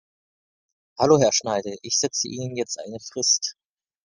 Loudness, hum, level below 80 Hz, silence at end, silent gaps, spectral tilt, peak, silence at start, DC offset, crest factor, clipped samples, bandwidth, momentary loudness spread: -22 LUFS; none; -64 dBFS; 0.55 s; none; -3 dB/octave; -4 dBFS; 1 s; under 0.1%; 22 dB; under 0.1%; 11 kHz; 12 LU